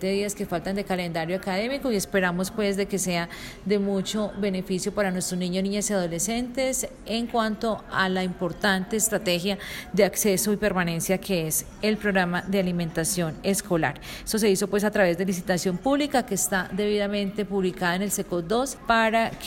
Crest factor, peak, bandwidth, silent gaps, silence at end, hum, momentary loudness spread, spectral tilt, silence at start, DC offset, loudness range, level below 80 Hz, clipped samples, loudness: 18 dB; -6 dBFS; 16.5 kHz; none; 0 s; none; 6 LU; -4 dB/octave; 0 s; under 0.1%; 2 LU; -48 dBFS; under 0.1%; -25 LUFS